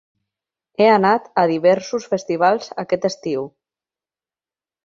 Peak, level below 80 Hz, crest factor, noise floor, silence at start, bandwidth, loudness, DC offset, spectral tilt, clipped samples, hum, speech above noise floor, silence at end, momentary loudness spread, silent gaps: -2 dBFS; -66 dBFS; 18 dB; under -90 dBFS; 0.8 s; 7.6 kHz; -18 LUFS; under 0.1%; -5.5 dB/octave; under 0.1%; none; over 72 dB; 1.35 s; 11 LU; none